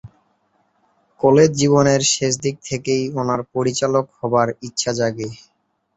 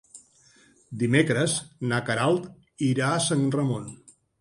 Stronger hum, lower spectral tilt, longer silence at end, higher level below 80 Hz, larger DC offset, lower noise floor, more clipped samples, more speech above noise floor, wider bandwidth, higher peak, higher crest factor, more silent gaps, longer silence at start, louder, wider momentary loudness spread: neither; about the same, -4.5 dB/octave vs -5 dB/octave; first, 0.6 s vs 0.45 s; first, -54 dBFS vs -64 dBFS; neither; first, -64 dBFS vs -58 dBFS; neither; first, 46 dB vs 34 dB; second, 8.2 kHz vs 11.5 kHz; first, -2 dBFS vs -6 dBFS; about the same, 18 dB vs 20 dB; neither; about the same, 0.05 s vs 0.15 s; first, -18 LUFS vs -25 LUFS; about the same, 9 LU vs 11 LU